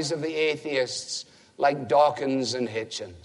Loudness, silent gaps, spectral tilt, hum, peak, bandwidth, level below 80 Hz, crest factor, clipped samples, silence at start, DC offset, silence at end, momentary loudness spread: -26 LUFS; none; -3.5 dB/octave; none; -8 dBFS; 11.5 kHz; -68 dBFS; 18 dB; under 0.1%; 0 s; under 0.1%; 0.05 s; 12 LU